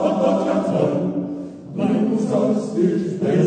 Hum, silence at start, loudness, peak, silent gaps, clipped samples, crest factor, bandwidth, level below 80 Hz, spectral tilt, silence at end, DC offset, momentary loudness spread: none; 0 s; -20 LUFS; -6 dBFS; none; under 0.1%; 14 dB; 9.4 kHz; -60 dBFS; -8 dB/octave; 0 s; under 0.1%; 8 LU